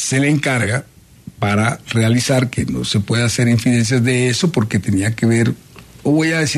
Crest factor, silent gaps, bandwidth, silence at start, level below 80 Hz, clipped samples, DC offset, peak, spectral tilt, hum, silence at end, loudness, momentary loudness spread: 14 dB; none; 13.5 kHz; 0 s; -46 dBFS; under 0.1%; under 0.1%; -2 dBFS; -5 dB/octave; none; 0 s; -16 LUFS; 5 LU